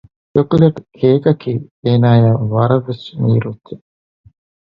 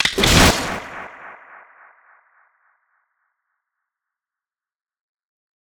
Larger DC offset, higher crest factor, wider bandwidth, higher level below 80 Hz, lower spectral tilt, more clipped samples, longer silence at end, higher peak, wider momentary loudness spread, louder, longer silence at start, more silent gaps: neither; second, 14 dB vs 24 dB; second, 5.4 kHz vs over 20 kHz; second, -48 dBFS vs -34 dBFS; first, -10.5 dB/octave vs -3 dB/octave; neither; second, 0.95 s vs 4.3 s; about the same, 0 dBFS vs 0 dBFS; second, 15 LU vs 26 LU; about the same, -14 LUFS vs -15 LUFS; first, 0.35 s vs 0 s; first, 1.71-1.83 s vs none